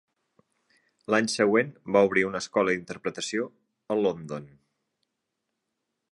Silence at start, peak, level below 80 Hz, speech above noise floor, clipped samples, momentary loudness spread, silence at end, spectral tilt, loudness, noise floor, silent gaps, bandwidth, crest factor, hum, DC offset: 1.1 s; -8 dBFS; -68 dBFS; 56 dB; under 0.1%; 14 LU; 1.65 s; -4.5 dB/octave; -26 LUFS; -82 dBFS; none; 11.5 kHz; 22 dB; none; under 0.1%